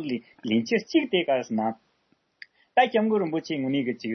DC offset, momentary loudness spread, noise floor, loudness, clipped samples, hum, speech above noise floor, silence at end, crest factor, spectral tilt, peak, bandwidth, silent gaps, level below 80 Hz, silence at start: under 0.1%; 9 LU; -69 dBFS; -25 LUFS; under 0.1%; none; 44 dB; 0 s; 18 dB; -5.5 dB/octave; -8 dBFS; 6.4 kHz; none; -76 dBFS; 0 s